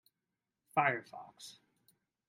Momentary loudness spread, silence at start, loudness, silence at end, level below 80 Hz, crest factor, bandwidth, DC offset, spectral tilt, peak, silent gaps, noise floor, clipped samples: 20 LU; 0.75 s; -34 LUFS; 0.8 s; -86 dBFS; 26 dB; 16 kHz; under 0.1%; -5 dB/octave; -16 dBFS; none; -89 dBFS; under 0.1%